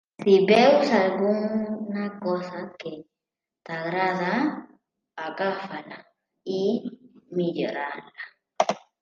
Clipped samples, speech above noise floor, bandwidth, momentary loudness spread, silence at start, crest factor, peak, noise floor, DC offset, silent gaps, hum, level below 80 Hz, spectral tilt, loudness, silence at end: under 0.1%; 64 dB; 7.6 kHz; 22 LU; 0.2 s; 20 dB; -4 dBFS; -88 dBFS; under 0.1%; none; none; -74 dBFS; -6 dB/octave; -24 LUFS; 0.25 s